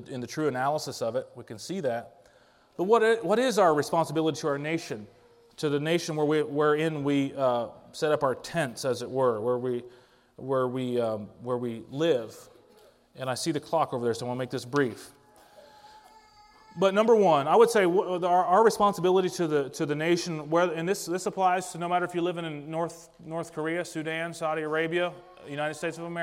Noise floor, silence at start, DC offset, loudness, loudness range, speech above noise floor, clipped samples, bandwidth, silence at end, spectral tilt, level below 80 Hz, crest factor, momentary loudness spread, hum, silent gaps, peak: -60 dBFS; 0 s; under 0.1%; -27 LUFS; 8 LU; 33 dB; under 0.1%; 16 kHz; 0 s; -5 dB/octave; -70 dBFS; 20 dB; 13 LU; none; none; -8 dBFS